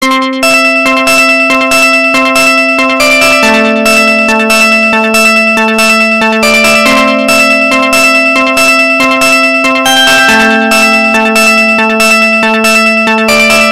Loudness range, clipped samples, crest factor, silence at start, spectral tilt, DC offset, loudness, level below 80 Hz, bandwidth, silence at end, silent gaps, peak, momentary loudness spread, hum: 0 LU; 0.2%; 6 dB; 0 s; -2 dB/octave; 2%; -5 LUFS; -42 dBFS; 17 kHz; 0 s; none; 0 dBFS; 2 LU; none